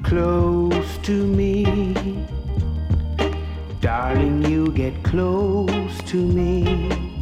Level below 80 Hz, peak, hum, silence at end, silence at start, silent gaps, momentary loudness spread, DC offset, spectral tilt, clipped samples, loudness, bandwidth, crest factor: -28 dBFS; -6 dBFS; none; 0 s; 0 s; none; 6 LU; under 0.1%; -7.5 dB/octave; under 0.1%; -21 LUFS; 13.5 kHz; 14 dB